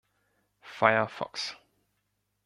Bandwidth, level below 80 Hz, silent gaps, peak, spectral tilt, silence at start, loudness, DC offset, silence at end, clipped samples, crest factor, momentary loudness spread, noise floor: 12 kHz; -74 dBFS; none; -4 dBFS; -4 dB/octave; 0.65 s; -28 LUFS; under 0.1%; 0.9 s; under 0.1%; 28 dB; 13 LU; -78 dBFS